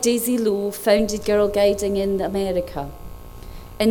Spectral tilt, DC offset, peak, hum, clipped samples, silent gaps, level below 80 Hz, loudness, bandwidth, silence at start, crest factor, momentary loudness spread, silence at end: -4.5 dB/octave; under 0.1%; -4 dBFS; none; under 0.1%; none; -40 dBFS; -21 LUFS; over 20 kHz; 0 s; 18 dB; 22 LU; 0 s